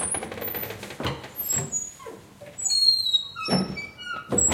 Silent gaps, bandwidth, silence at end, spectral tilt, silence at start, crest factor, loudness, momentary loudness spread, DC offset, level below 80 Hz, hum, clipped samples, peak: none; 16.5 kHz; 0 s; -1.5 dB/octave; 0 s; 18 dB; -24 LUFS; 18 LU; under 0.1%; -54 dBFS; none; under 0.1%; -8 dBFS